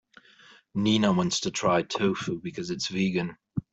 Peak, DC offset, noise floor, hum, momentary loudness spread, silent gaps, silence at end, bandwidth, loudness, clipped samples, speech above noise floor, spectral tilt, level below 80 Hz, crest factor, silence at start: -10 dBFS; under 0.1%; -56 dBFS; none; 11 LU; none; 0.1 s; 8.2 kHz; -27 LUFS; under 0.1%; 29 dB; -5 dB/octave; -60 dBFS; 18 dB; 0.75 s